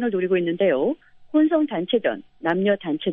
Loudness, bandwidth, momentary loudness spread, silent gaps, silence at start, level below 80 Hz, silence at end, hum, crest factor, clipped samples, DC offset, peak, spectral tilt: -22 LUFS; 3.8 kHz; 7 LU; none; 0 s; -64 dBFS; 0 s; none; 14 dB; under 0.1%; under 0.1%; -8 dBFS; -9.5 dB/octave